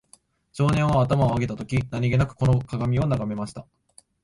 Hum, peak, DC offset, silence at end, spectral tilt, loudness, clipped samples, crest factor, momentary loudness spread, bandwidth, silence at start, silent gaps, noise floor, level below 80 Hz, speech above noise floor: none; -8 dBFS; under 0.1%; 0.6 s; -8 dB/octave; -23 LUFS; under 0.1%; 16 dB; 11 LU; 11.5 kHz; 0.55 s; none; -58 dBFS; -42 dBFS; 36 dB